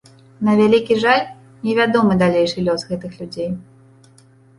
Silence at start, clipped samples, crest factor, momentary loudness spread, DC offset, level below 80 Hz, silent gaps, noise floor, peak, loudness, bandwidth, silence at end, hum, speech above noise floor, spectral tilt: 0.4 s; under 0.1%; 16 dB; 13 LU; under 0.1%; -52 dBFS; none; -50 dBFS; -2 dBFS; -17 LUFS; 11.5 kHz; 0.95 s; none; 33 dB; -6.5 dB/octave